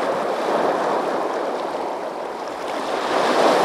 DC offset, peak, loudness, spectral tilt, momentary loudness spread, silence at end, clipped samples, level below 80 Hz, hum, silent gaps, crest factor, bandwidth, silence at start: under 0.1%; -4 dBFS; -22 LUFS; -3.5 dB/octave; 10 LU; 0 s; under 0.1%; -66 dBFS; none; none; 18 dB; 16 kHz; 0 s